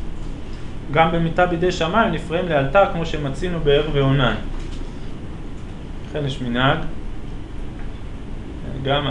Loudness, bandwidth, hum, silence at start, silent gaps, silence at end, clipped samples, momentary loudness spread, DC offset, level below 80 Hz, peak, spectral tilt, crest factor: -20 LUFS; 10.5 kHz; none; 0 s; none; 0 s; under 0.1%; 17 LU; under 0.1%; -30 dBFS; -2 dBFS; -6.5 dB/octave; 20 dB